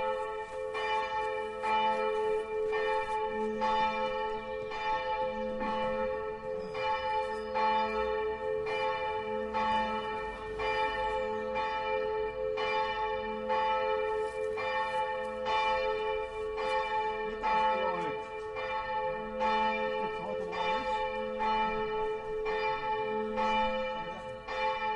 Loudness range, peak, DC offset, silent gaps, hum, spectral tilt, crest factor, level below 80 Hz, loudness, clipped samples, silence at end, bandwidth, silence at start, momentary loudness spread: 1 LU; -18 dBFS; under 0.1%; none; none; -4.5 dB/octave; 14 dB; -54 dBFS; -33 LUFS; under 0.1%; 0 s; 11 kHz; 0 s; 6 LU